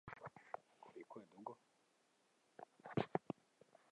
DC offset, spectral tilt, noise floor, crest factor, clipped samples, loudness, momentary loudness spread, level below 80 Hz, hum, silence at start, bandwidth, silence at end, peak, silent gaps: under 0.1%; -7.5 dB/octave; -79 dBFS; 32 dB; under 0.1%; -50 LUFS; 18 LU; -80 dBFS; none; 0.05 s; 11 kHz; 0.75 s; -20 dBFS; none